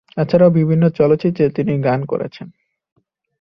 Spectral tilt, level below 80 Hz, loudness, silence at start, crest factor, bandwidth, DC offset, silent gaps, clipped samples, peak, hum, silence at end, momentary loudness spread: -10.5 dB/octave; -52 dBFS; -16 LUFS; 0.15 s; 14 dB; 5.8 kHz; under 0.1%; none; under 0.1%; -2 dBFS; none; 0.95 s; 11 LU